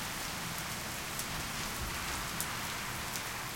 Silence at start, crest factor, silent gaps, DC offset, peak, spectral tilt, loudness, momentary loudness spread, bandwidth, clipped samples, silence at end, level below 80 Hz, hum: 0 s; 26 dB; none; under 0.1%; -12 dBFS; -2 dB/octave; -37 LUFS; 2 LU; 17 kHz; under 0.1%; 0 s; -52 dBFS; none